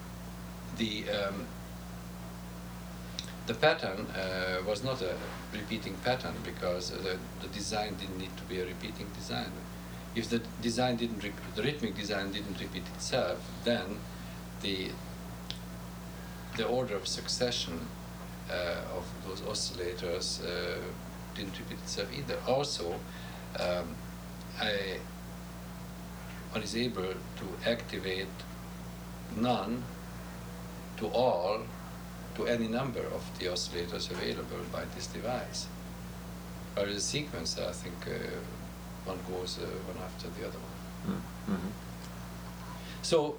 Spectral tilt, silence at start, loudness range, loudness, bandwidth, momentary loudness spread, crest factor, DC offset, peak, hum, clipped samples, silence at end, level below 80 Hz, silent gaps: -4.5 dB/octave; 0 s; 4 LU; -36 LUFS; over 20 kHz; 12 LU; 24 dB; under 0.1%; -12 dBFS; 60 Hz at -55 dBFS; under 0.1%; 0 s; -50 dBFS; none